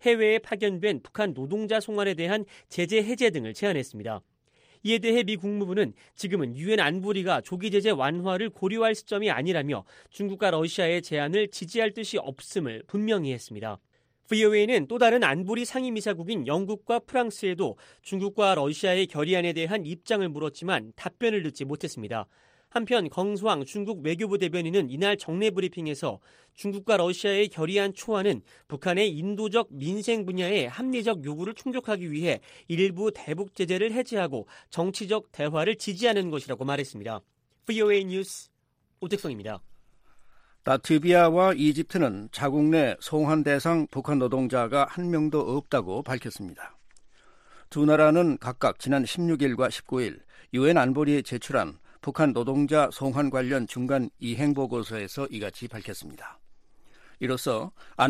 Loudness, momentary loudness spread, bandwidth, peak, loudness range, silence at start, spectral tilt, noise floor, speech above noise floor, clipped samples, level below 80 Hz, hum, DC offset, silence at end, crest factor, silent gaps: -27 LUFS; 12 LU; 15.5 kHz; -6 dBFS; 5 LU; 0.05 s; -5.5 dB/octave; -72 dBFS; 46 dB; under 0.1%; -66 dBFS; none; under 0.1%; 0 s; 20 dB; none